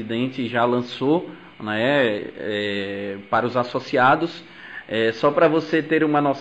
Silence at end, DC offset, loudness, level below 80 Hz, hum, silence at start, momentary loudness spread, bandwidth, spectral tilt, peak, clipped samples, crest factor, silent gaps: 0 s; under 0.1%; -21 LUFS; -62 dBFS; none; 0 s; 11 LU; 8.2 kHz; -6.5 dB/octave; -6 dBFS; under 0.1%; 16 dB; none